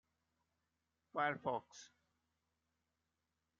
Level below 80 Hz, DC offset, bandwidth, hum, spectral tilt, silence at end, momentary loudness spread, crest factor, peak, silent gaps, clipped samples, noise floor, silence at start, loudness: -90 dBFS; under 0.1%; 7.2 kHz; none; -3 dB/octave; 1.75 s; 20 LU; 24 dB; -24 dBFS; none; under 0.1%; -88 dBFS; 1.15 s; -42 LUFS